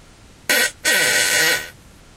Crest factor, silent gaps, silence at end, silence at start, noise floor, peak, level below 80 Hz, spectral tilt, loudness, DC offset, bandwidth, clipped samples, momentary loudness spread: 18 dB; none; 0.45 s; 0.5 s; -43 dBFS; -2 dBFS; -52 dBFS; 0.5 dB/octave; -16 LUFS; under 0.1%; 16 kHz; under 0.1%; 12 LU